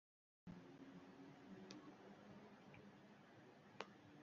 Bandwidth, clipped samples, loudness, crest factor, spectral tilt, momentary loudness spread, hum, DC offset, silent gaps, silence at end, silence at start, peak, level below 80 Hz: 7.2 kHz; under 0.1%; -62 LUFS; 32 dB; -4.5 dB/octave; 8 LU; none; under 0.1%; none; 0 s; 0.45 s; -30 dBFS; -86 dBFS